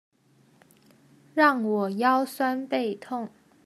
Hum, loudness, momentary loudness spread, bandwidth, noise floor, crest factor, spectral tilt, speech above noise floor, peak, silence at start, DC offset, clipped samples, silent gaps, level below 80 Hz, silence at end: none; -25 LUFS; 13 LU; 14.5 kHz; -61 dBFS; 22 dB; -5.5 dB/octave; 37 dB; -6 dBFS; 1.35 s; under 0.1%; under 0.1%; none; -84 dBFS; 0.4 s